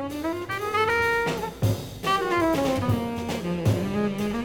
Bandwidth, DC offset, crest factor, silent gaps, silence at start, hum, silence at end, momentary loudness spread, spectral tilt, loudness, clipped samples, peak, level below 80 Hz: 19.5 kHz; under 0.1%; 14 dB; none; 0 s; none; 0 s; 7 LU; -6 dB/octave; -25 LUFS; under 0.1%; -10 dBFS; -46 dBFS